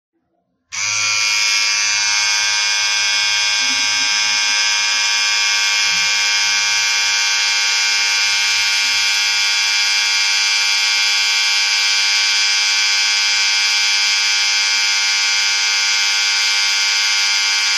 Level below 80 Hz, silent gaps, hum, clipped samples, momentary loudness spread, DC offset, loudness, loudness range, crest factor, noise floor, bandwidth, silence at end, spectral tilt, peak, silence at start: -70 dBFS; none; none; under 0.1%; 1 LU; under 0.1%; -13 LUFS; 1 LU; 14 dB; -67 dBFS; 15.5 kHz; 0 s; 4 dB/octave; -2 dBFS; 0.7 s